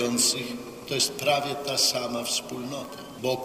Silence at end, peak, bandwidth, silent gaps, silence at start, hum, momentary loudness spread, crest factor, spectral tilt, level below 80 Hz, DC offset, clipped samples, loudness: 0 s; -8 dBFS; 16 kHz; none; 0 s; none; 13 LU; 20 dB; -2 dB/octave; -64 dBFS; under 0.1%; under 0.1%; -26 LUFS